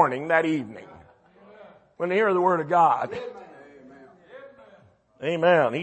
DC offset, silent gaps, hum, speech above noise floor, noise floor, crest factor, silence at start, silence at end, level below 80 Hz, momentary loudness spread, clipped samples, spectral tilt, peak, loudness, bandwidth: under 0.1%; none; none; 34 dB; -56 dBFS; 20 dB; 0 s; 0 s; -70 dBFS; 20 LU; under 0.1%; -6.5 dB/octave; -6 dBFS; -23 LUFS; 8.6 kHz